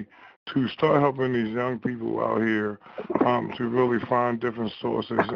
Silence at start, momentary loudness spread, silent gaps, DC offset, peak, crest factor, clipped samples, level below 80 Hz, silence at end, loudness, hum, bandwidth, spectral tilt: 0 s; 8 LU; 0.36-0.46 s; under 0.1%; -8 dBFS; 18 dB; under 0.1%; -62 dBFS; 0 s; -25 LUFS; none; 6.4 kHz; -8.5 dB/octave